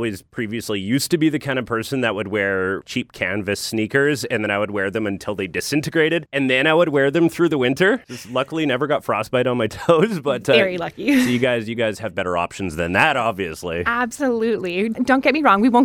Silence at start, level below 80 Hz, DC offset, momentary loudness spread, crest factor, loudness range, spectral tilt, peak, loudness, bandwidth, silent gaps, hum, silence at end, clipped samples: 0 s; -52 dBFS; under 0.1%; 9 LU; 18 dB; 3 LU; -5 dB/octave; 0 dBFS; -20 LUFS; 18 kHz; none; none; 0 s; under 0.1%